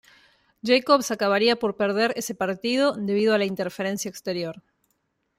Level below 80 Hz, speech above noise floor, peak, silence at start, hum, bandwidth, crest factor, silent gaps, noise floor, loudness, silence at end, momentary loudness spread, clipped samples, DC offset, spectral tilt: -68 dBFS; 50 dB; -6 dBFS; 0.65 s; none; 16 kHz; 20 dB; none; -73 dBFS; -23 LUFS; 0.8 s; 9 LU; under 0.1%; under 0.1%; -4 dB/octave